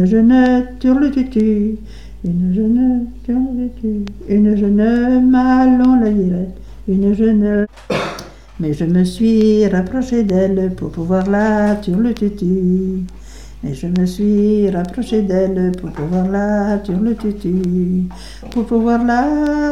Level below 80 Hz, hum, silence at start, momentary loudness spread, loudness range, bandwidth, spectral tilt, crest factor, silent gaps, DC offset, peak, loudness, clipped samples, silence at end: -34 dBFS; none; 0 s; 11 LU; 4 LU; 11.5 kHz; -8 dB/octave; 12 dB; none; 1%; -2 dBFS; -15 LUFS; under 0.1%; 0 s